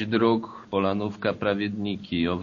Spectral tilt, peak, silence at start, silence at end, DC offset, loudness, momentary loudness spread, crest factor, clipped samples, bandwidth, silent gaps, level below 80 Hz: -5 dB/octave; -8 dBFS; 0 s; 0 s; under 0.1%; -26 LUFS; 6 LU; 18 dB; under 0.1%; 7 kHz; none; -56 dBFS